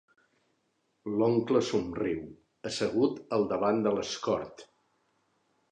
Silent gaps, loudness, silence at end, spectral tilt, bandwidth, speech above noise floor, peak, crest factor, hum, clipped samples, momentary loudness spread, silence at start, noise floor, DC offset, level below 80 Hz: none; -30 LUFS; 1.05 s; -5.5 dB/octave; 10.5 kHz; 46 dB; -12 dBFS; 20 dB; none; under 0.1%; 12 LU; 1.05 s; -76 dBFS; under 0.1%; -64 dBFS